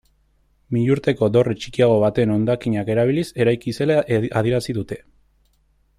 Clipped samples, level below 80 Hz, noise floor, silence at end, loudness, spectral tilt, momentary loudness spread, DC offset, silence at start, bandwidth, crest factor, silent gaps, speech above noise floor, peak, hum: under 0.1%; -50 dBFS; -61 dBFS; 1 s; -20 LUFS; -7.5 dB/octave; 7 LU; under 0.1%; 0.7 s; 13.5 kHz; 16 dB; none; 42 dB; -4 dBFS; none